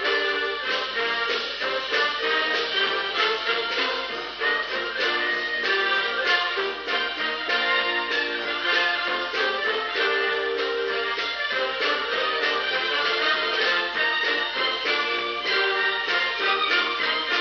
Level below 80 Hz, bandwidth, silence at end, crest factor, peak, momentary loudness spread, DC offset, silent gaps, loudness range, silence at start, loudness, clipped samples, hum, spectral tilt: -60 dBFS; 7 kHz; 0 s; 16 dB; -8 dBFS; 4 LU; under 0.1%; none; 1 LU; 0 s; -23 LUFS; under 0.1%; none; -1.5 dB/octave